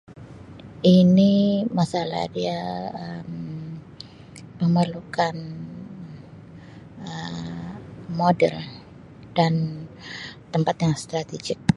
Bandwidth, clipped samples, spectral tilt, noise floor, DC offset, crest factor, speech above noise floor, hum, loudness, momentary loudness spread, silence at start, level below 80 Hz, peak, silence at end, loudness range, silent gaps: 11 kHz; under 0.1%; -7 dB/octave; -44 dBFS; under 0.1%; 22 dB; 23 dB; none; -23 LUFS; 25 LU; 0.1 s; -56 dBFS; -2 dBFS; 0 s; 7 LU; none